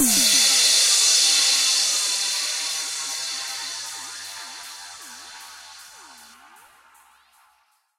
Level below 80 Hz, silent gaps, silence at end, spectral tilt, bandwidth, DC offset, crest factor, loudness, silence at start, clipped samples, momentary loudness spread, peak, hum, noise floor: -66 dBFS; none; 1.75 s; 2 dB/octave; 16 kHz; under 0.1%; 18 dB; -17 LUFS; 0 s; under 0.1%; 24 LU; -6 dBFS; none; -64 dBFS